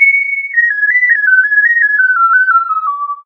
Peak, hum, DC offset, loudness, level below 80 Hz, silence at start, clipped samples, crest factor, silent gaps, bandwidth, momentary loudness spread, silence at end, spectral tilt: 0 dBFS; none; under 0.1%; -9 LUFS; under -90 dBFS; 0 s; under 0.1%; 10 dB; none; 6 kHz; 5 LU; 0.05 s; 3 dB/octave